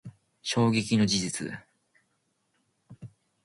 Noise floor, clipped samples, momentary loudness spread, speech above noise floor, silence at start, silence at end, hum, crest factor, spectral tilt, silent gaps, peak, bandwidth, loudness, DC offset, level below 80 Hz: -75 dBFS; under 0.1%; 25 LU; 49 dB; 0.05 s; 0.35 s; none; 18 dB; -4.5 dB/octave; none; -12 dBFS; 11.5 kHz; -27 LUFS; under 0.1%; -62 dBFS